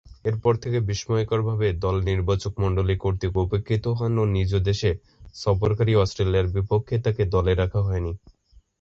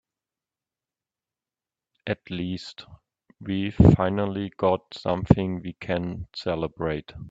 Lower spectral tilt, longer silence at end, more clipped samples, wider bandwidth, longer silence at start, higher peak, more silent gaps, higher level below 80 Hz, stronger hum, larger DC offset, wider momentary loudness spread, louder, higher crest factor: second, -7 dB/octave vs -8.5 dB/octave; first, 0.5 s vs 0 s; neither; about the same, 7.6 kHz vs 7.8 kHz; second, 0.1 s vs 2.05 s; second, -6 dBFS vs 0 dBFS; neither; first, -36 dBFS vs -44 dBFS; neither; neither; second, 4 LU vs 16 LU; about the same, -24 LUFS vs -25 LUFS; second, 16 dB vs 26 dB